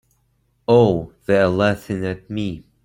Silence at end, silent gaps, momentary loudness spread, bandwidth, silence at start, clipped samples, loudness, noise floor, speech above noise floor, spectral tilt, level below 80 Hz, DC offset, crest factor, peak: 0.25 s; none; 12 LU; 16.5 kHz; 0.7 s; under 0.1%; -19 LUFS; -64 dBFS; 46 dB; -7.5 dB/octave; -50 dBFS; under 0.1%; 18 dB; -2 dBFS